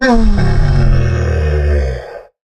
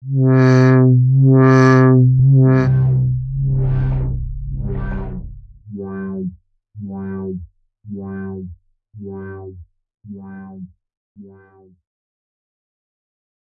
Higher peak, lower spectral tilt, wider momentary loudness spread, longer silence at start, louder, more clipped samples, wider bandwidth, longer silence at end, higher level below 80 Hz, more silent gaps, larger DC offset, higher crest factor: about the same, 0 dBFS vs -2 dBFS; second, -7.5 dB/octave vs -9.5 dB/octave; second, 13 LU vs 24 LU; about the same, 0 s vs 0.05 s; about the same, -14 LUFS vs -14 LUFS; neither; first, 8.6 kHz vs 6.4 kHz; second, 0.3 s vs 2.35 s; first, -14 dBFS vs -32 dBFS; second, none vs 10.97-11.15 s; neither; second, 10 dB vs 16 dB